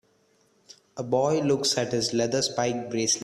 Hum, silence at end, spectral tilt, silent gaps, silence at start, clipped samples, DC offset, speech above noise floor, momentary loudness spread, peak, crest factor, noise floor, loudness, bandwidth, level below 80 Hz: none; 0 s; -3.5 dB/octave; none; 0.7 s; under 0.1%; under 0.1%; 40 dB; 5 LU; -10 dBFS; 18 dB; -65 dBFS; -25 LUFS; 14 kHz; -64 dBFS